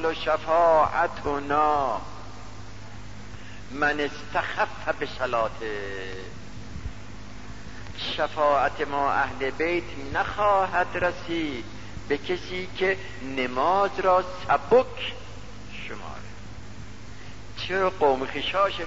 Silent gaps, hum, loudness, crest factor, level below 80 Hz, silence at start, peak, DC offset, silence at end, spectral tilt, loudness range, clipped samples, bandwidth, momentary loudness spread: none; none; -25 LUFS; 18 dB; -48 dBFS; 0 s; -8 dBFS; 1%; 0 s; -5 dB/octave; 6 LU; under 0.1%; 8 kHz; 21 LU